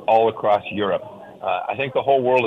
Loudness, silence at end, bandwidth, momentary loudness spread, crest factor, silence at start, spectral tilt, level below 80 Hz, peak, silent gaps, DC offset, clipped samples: -21 LUFS; 0 s; 6.4 kHz; 10 LU; 14 dB; 0 s; -7 dB/octave; -62 dBFS; -6 dBFS; none; under 0.1%; under 0.1%